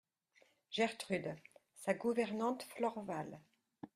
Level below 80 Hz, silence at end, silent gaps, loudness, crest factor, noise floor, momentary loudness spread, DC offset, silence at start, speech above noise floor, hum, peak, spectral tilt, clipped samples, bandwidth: -82 dBFS; 0.1 s; none; -40 LUFS; 20 dB; -73 dBFS; 14 LU; under 0.1%; 0.7 s; 34 dB; none; -20 dBFS; -5 dB/octave; under 0.1%; 15.5 kHz